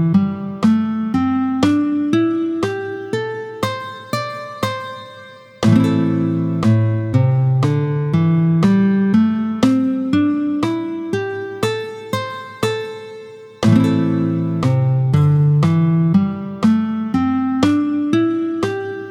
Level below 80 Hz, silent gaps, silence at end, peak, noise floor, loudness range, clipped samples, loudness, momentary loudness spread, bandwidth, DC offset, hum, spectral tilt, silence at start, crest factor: -52 dBFS; none; 0 s; 0 dBFS; -39 dBFS; 5 LU; under 0.1%; -17 LUFS; 11 LU; 14.5 kHz; under 0.1%; none; -8 dB/octave; 0 s; 16 dB